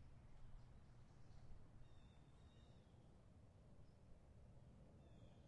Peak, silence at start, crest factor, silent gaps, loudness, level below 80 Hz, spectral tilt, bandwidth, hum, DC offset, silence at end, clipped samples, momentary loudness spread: -48 dBFS; 0 s; 16 dB; none; -68 LUFS; -68 dBFS; -7 dB/octave; 9 kHz; none; under 0.1%; 0 s; under 0.1%; 3 LU